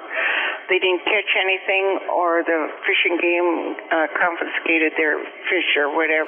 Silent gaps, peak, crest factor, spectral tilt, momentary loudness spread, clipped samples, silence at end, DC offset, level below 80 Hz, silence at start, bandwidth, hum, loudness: none; -6 dBFS; 14 dB; -6.5 dB/octave; 5 LU; under 0.1%; 0 s; under 0.1%; -78 dBFS; 0 s; 3.6 kHz; none; -19 LUFS